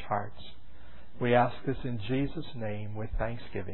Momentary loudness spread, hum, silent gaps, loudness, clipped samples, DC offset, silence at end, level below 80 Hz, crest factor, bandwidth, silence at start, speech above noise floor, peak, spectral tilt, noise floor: 14 LU; none; none; -32 LUFS; under 0.1%; 2%; 0 s; -44 dBFS; 22 dB; 4.2 kHz; 0 s; 21 dB; -10 dBFS; -10.5 dB/octave; -53 dBFS